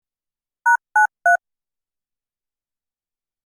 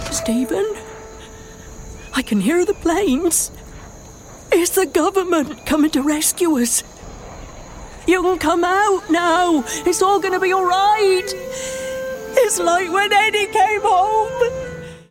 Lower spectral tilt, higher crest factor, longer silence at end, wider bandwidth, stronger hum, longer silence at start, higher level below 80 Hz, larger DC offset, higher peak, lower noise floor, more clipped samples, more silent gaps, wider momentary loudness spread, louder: second, 0.5 dB/octave vs -3 dB/octave; about the same, 18 dB vs 16 dB; first, 2.1 s vs 0.1 s; first, 18.5 kHz vs 16.5 kHz; neither; first, 0.65 s vs 0 s; second, -88 dBFS vs -42 dBFS; neither; second, -6 dBFS vs -2 dBFS; first, under -90 dBFS vs -39 dBFS; neither; neither; second, 4 LU vs 21 LU; about the same, -18 LUFS vs -17 LUFS